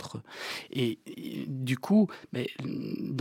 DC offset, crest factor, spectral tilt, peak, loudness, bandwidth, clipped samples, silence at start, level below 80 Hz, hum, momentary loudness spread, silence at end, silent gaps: under 0.1%; 18 dB; -6.5 dB/octave; -14 dBFS; -32 LUFS; 16.5 kHz; under 0.1%; 0 s; -76 dBFS; none; 14 LU; 0 s; none